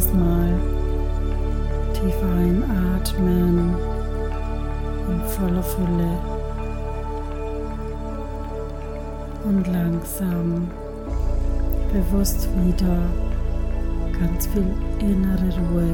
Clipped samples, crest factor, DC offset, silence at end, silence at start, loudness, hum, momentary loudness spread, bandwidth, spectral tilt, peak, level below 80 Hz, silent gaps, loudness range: under 0.1%; 14 dB; under 0.1%; 0 s; 0 s; -24 LUFS; none; 10 LU; 18 kHz; -7 dB/octave; -6 dBFS; -24 dBFS; none; 5 LU